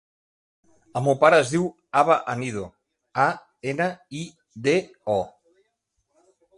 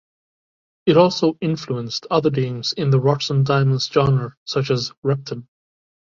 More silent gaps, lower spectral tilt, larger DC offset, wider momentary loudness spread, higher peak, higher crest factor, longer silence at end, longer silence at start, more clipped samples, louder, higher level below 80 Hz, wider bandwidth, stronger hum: second, none vs 4.37-4.46 s, 4.97-5.02 s; about the same, -5.5 dB/octave vs -6.5 dB/octave; neither; first, 18 LU vs 9 LU; about the same, -2 dBFS vs -2 dBFS; about the same, 22 dB vs 18 dB; first, 1.3 s vs 0.7 s; about the same, 0.95 s vs 0.85 s; neither; second, -23 LUFS vs -19 LUFS; second, -62 dBFS vs -54 dBFS; first, 11.5 kHz vs 7.4 kHz; neither